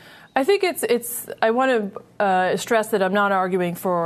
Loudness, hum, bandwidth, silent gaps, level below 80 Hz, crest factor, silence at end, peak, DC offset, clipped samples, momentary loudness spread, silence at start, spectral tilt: -21 LUFS; none; 13.5 kHz; none; -68 dBFS; 16 dB; 0 s; -6 dBFS; under 0.1%; under 0.1%; 5 LU; 0.05 s; -4.5 dB/octave